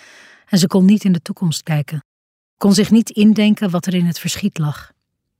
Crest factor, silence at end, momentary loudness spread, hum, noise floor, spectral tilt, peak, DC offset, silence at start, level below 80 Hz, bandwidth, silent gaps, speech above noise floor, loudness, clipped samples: 14 dB; 0.55 s; 10 LU; none; -45 dBFS; -6 dB/octave; -2 dBFS; under 0.1%; 0.5 s; -54 dBFS; 16 kHz; 2.05-2.57 s; 30 dB; -16 LUFS; under 0.1%